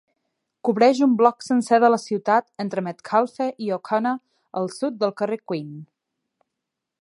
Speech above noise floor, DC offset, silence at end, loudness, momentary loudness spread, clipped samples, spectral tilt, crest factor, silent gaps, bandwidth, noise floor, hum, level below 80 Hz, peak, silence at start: 62 dB; under 0.1%; 1.15 s; -22 LUFS; 13 LU; under 0.1%; -6 dB/octave; 20 dB; none; 11.5 kHz; -83 dBFS; none; -78 dBFS; -2 dBFS; 0.65 s